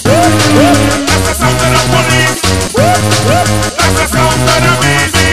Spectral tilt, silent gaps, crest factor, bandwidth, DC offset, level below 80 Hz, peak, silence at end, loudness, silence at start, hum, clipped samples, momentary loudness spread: -4 dB/octave; none; 10 dB; 14.5 kHz; 5%; -24 dBFS; 0 dBFS; 0 s; -9 LUFS; 0 s; none; 0.5%; 3 LU